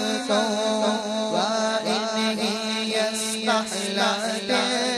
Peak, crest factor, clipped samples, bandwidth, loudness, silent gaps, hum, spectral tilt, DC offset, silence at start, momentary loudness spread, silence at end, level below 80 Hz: -10 dBFS; 14 dB; under 0.1%; 13 kHz; -23 LUFS; none; none; -2.5 dB/octave; under 0.1%; 0 s; 3 LU; 0 s; -66 dBFS